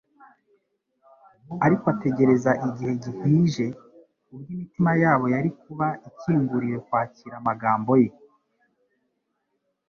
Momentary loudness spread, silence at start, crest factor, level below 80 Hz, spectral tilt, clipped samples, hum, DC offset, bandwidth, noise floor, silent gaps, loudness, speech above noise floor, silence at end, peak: 13 LU; 1.5 s; 18 dB; -62 dBFS; -8.5 dB/octave; under 0.1%; none; under 0.1%; 7.2 kHz; -76 dBFS; none; -23 LUFS; 53 dB; 1.8 s; -6 dBFS